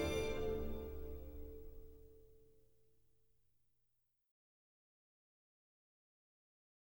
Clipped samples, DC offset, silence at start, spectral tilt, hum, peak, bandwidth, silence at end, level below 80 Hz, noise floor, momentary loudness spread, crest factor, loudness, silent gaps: under 0.1%; under 0.1%; 0 s; -5.5 dB/octave; none; -28 dBFS; over 20 kHz; 4.5 s; -54 dBFS; -84 dBFS; 23 LU; 20 dB; -45 LUFS; none